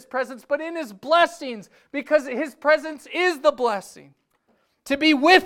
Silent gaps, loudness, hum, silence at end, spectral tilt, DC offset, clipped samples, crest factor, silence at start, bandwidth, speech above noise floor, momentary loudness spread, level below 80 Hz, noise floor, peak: none; -22 LUFS; none; 0 s; -3 dB/octave; under 0.1%; under 0.1%; 20 dB; 0.15 s; 16 kHz; 45 dB; 13 LU; -64 dBFS; -67 dBFS; -2 dBFS